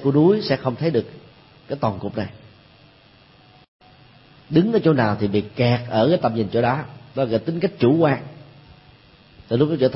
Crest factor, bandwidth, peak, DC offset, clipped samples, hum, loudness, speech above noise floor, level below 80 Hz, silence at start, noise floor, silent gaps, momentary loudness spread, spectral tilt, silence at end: 18 dB; 5.8 kHz; -4 dBFS; under 0.1%; under 0.1%; none; -20 LUFS; 32 dB; -56 dBFS; 0 s; -51 dBFS; 3.68-3.79 s; 11 LU; -11.5 dB/octave; 0 s